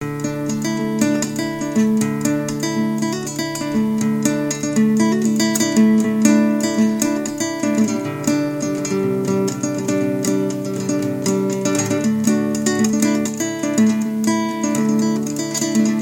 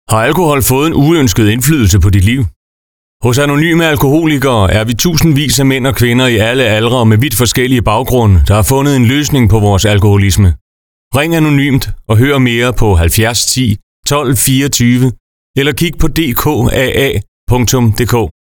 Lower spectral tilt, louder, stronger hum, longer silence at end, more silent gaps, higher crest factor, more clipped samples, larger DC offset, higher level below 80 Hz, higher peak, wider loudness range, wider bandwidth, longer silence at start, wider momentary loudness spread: about the same, -5 dB/octave vs -5 dB/octave; second, -19 LUFS vs -10 LUFS; neither; second, 0 s vs 0.2 s; second, none vs 2.56-3.20 s, 10.61-11.11 s, 13.83-14.03 s, 15.20-15.54 s, 17.28-17.47 s; first, 18 dB vs 10 dB; neither; neither; second, -56 dBFS vs -24 dBFS; about the same, 0 dBFS vs 0 dBFS; about the same, 4 LU vs 2 LU; second, 17 kHz vs 20 kHz; about the same, 0 s vs 0.1 s; about the same, 6 LU vs 5 LU